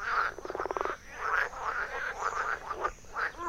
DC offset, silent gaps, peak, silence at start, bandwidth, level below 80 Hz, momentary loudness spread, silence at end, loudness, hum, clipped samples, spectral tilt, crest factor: under 0.1%; none; -14 dBFS; 0 s; 16 kHz; -54 dBFS; 6 LU; 0 s; -33 LUFS; none; under 0.1%; -3 dB/octave; 20 dB